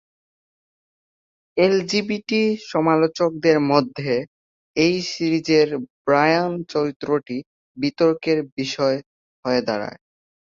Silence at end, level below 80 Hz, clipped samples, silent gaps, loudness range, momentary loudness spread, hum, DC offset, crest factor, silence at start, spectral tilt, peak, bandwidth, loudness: 0.6 s; -62 dBFS; under 0.1%; 4.28-4.74 s, 5.90-6.05 s, 6.96-7.00 s, 7.46-7.75 s, 8.52-8.57 s, 9.06-9.43 s; 3 LU; 10 LU; none; under 0.1%; 18 dB; 1.55 s; -5.5 dB/octave; -2 dBFS; 7.6 kHz; -21 LUFS